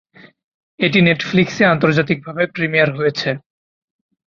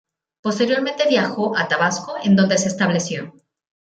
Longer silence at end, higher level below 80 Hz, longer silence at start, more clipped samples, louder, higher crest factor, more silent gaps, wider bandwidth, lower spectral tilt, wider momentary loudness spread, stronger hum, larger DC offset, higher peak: first, 0.95 s vs 0.7 s; first, -54 dBFS vs -62 dBFS; first, 0.8 s vs 0.45 s; neither; first, -16 LUFS vs -19 LUFS; about the same, 16 dB vs 16 dB; neither; second, 7.2 kHz vs 9 kHz; first, -6.5 dB/octave vs -4.5 dB/octave; second, 8 LU vs 11 LU; neither; neither; about the same, -2 dBFS vs -4 dBFS